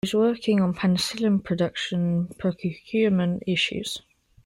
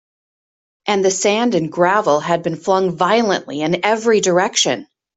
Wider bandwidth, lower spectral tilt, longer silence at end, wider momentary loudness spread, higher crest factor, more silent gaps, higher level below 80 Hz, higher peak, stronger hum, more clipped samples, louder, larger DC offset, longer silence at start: first, 13.5 kHz vs 8.4 kHz; first, -6 dB/octave vs -3.5 dB/octave; about the same, 0.45 s vs 0.35 s; about the same, 7 LU vs 6 LU; about the same, 14 dB vs 16 dB; neither; about the same, -58 dBFS vs -62 dBFS; second, -10 dBFS vs 0 dBFS; neither; neither; second, -24 LUFS vs -16 LUFS; neither; second, 0.05 s vs 0.85 s